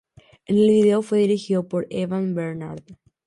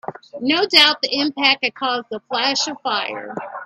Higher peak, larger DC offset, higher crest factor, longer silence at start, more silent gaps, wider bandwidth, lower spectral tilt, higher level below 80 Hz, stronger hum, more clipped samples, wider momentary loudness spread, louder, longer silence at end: second, -8 dBFS vs 0 dBFS; neither; second, 14 dB vs 20 dB; first, 0.5 s vs 0.05 s; neither; second, 11 kHz vs 15 kHz; first, -7.5 dB/octave vs -1.5 dB/octave; first, -62 dBFS vs -68 dBFS; neither; neither; about the same, 15 LU vs 15 LU; second, -21 LUFS vs -17 LUFS; first, 0.35 s vs 0 s